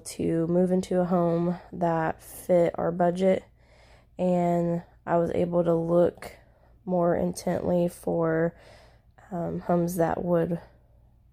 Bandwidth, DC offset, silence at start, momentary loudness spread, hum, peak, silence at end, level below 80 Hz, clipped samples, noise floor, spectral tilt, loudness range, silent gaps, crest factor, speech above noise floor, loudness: 16 kHz; under 0.1%; 0.05 s; 8 LU; none; -12 dBFS; 0.7 s; -54 dBFS; under 0.1%; -58 dBFS; -7.5 dB/octave; 3 LU; none; 14 dB; 32 dB; -26 LUFS